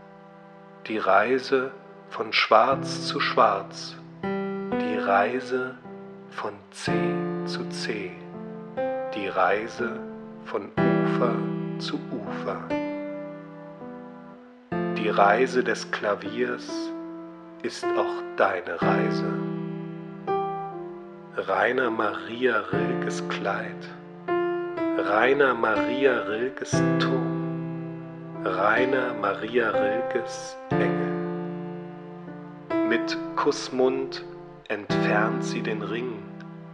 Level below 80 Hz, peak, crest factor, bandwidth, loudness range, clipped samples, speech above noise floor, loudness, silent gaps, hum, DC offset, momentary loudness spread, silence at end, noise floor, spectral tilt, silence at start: -64 dBFS; -4 dBFS; 24 dB; 10.5 kHz; 5 LU; under 0.1%; 23 dB; -26 LUFS; none; none; under 0.1%; 18 LU; 0 s; -47 dBFS; -5.5 dB/octave; 0 s